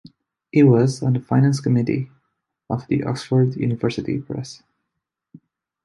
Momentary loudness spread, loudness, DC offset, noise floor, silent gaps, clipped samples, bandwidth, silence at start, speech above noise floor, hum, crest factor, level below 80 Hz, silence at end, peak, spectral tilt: 14 LU; -20 LUFS; under 0.1%; -81 dBFS; none; under 0.1%; 11.5 kHz; 0.55 s; 62 dB; none; 18 dB; -56 dBFS; 1.3 s; -4 dBFS; -8 dB/octave